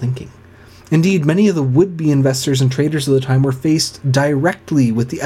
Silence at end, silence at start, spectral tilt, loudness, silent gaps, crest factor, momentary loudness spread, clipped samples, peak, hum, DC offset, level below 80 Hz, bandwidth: 0 s; 0 s; -6 dB/octave; -15 LUFS; none; 14 dB; 4 LU; under 0.1%; 0 dBFS; none; under 0.1%; -50 dBFS; 15 kHz